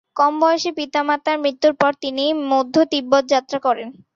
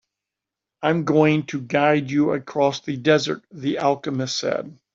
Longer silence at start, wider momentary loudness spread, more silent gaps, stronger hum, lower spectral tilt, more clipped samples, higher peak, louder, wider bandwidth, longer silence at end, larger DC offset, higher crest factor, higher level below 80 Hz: second, 0.15 s vs 0.8 s; second, 5 LU vs 8 LU; neither; neither; second, -3.5 dB/octave vs -5.5 dB/octave; neither; about the same, -2 dBFS vs -4 dBFS; first, -18 LUFS vs -21 LUFS; about the same, 7.6 kHz vs 7.6 kHz; about the same, 0.25 s vs 0.2 s; neither; about the same, 16 dB vs 18 dB; about the same, -66 dBFS vs -64 dBFS